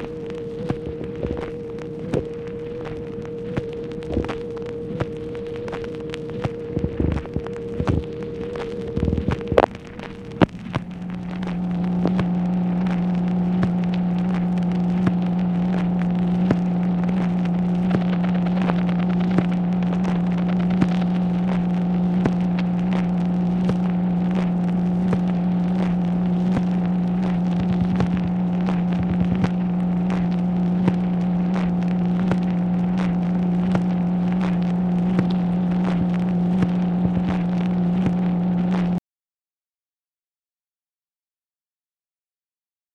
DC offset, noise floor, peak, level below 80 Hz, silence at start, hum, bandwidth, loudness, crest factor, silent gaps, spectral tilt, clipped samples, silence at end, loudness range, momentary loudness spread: under 0.1%; under -90 dBFS; 0 dBFS; -40 dBFS; 0 s; none; 6.2 kHz; -22 LUFS; 22 dB; none; -9.5 dB/octave; under 0.1%; 3.95 s; 8 LU; 9 LU